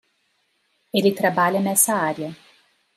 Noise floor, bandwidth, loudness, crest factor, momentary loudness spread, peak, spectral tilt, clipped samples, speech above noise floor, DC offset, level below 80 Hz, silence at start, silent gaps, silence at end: -68 dBFS; 16 kHz; -20 LUFS; 20 dB; 10 LU; -4 dBFS; -3.5 dB/octave; under 0.1%; 48 dB; under 0.1%; -72 dBFS; 0.95 s; none; 0.6 s